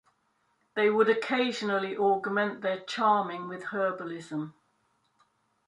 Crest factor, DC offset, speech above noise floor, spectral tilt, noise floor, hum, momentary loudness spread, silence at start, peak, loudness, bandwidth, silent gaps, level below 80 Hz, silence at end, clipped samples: 20 dB; under 0.1%; 45 dB; -5 dB/octave; -73 dBFS; none; 12 LU; 0.75 s; -10 dBFS; -29 LUFS; 11 kHz; none; -80 dBFS; 1.2 s; under 0.1%